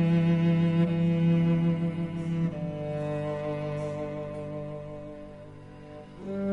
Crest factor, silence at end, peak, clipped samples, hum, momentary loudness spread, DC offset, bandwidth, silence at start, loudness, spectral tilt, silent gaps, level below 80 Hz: 14 dB; 0 s; -14 dBFS; under 0.1%; 50 Hz at -45 dBFS; 21 LU; under 0.1%; 4.9 kHz; 0 s; -28 LUFS; -9.5 dB/octave; none; -56 dBFS